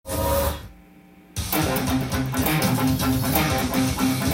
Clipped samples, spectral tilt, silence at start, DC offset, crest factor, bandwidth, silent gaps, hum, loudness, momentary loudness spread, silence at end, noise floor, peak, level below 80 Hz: under 0.1%; -5 dB/octave; 0.05 s; under 0.1%; 18 dB; 17 kHz; none; none; -22 LUFS; 6 LU; 0 s; -49 dBFS; -4 dBFS; -36 dBFS